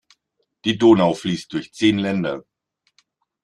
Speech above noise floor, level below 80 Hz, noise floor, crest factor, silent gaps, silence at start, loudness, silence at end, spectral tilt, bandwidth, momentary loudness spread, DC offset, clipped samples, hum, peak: 54 dB; -58 dBFS; -73 dBFS; 18 dB; none; 0.65 s; -19 LUFS; 1.05 s; -6 dB/octave; 10.5 kHz; 13 LU; under 0.1%; under 0.1%; none; -2 dBFS